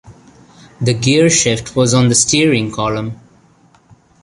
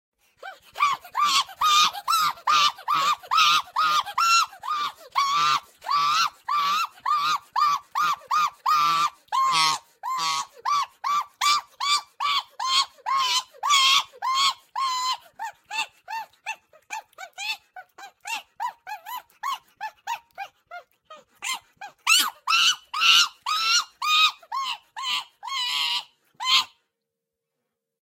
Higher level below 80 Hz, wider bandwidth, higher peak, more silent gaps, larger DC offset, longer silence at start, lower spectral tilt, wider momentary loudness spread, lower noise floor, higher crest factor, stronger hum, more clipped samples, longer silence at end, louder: first, -44 dBFS vs -76 dBFS; second, 11.5 kHz vs 16.5 kHz; first, 0 dBFS vs -4 dBFS; neither; neither; second, 0.05 s vs 0.4 s; first, -4 dB/octave vs 2 dB/octave; second, 9 LU vs 17 LU; second, -50 dBFS vs -84 dBFS; about the same, 16 dB vs 20 dB; neither; neither; second, 1.05 s vs 1.4 s; first, -13 LUFS vs -22 LUFS